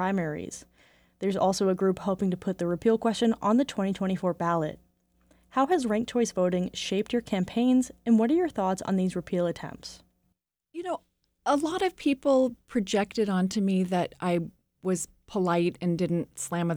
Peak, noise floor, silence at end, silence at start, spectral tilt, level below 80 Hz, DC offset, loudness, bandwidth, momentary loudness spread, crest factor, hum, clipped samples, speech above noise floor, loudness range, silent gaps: -12 dBFS; -76 dBFS; 0 s; 0 s; -6 dB/octave; -60 dBFS; under 0.1%; -27 LUFS; 15.5 kHz; 11 LU; 16 dB; none; under 0.1%; 49 dB; 3 LU; none